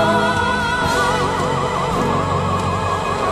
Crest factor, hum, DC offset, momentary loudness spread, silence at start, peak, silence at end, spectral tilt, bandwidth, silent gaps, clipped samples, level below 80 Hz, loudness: 14 dB; none; under 0.1%; 3 LU; 0 s; -4 dBFS; 0 s; -5 dB/octave; 14.5 kHz; none; under 0.1%; -36 dBFS; -18 LUFS